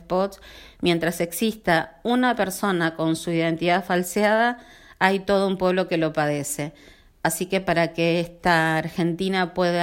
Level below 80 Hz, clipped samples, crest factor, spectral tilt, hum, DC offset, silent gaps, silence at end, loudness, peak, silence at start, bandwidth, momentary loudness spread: -52 dBFS; under 0.1%; 20 dB; -5 dB/octave; none; under 0.1%; none; 0 s; -23 LUFS; -4 dBFS; 0 s; 16.5 kHz; 6 LU